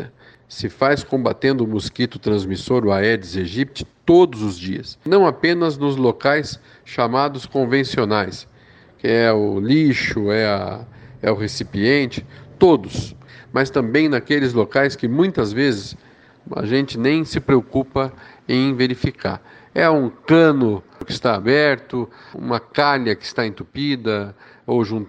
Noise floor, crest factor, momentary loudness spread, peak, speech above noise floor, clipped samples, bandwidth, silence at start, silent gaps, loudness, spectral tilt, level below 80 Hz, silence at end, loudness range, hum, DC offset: -48 dBFS; 18 dB; 13 LU; -2 dBFS; 30 dB; under 0.1%; 9.2 kHz; 0 s; none; -19 LUFS; -6.5 dB/octave; -48 dBFS; 0 s; 2 LU; none; under 0.1%